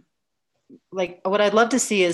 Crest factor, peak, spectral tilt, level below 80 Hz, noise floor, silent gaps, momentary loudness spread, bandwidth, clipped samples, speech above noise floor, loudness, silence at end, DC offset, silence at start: 18 dB; -6 dBFS; -3 dB/octave; -68 dBFS; -80 dBFS; none; 11 LU; 13 kHz; under 0.1%; 59 dB; -21 LUFS; 0 s; under 0.1%; 0.9 s